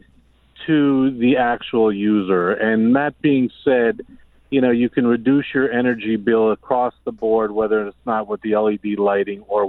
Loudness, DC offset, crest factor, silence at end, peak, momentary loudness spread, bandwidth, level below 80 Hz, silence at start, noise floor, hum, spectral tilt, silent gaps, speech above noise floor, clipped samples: -18 LUFS; under 0.1%; 14 dB; 0 s; -4 dBFS; 6 LU; 4.1 kHz; -54 dBFS; 0.6 s; -54 dBFS; none; -9.5 dB/octave; none; 36 dB; under 0.1%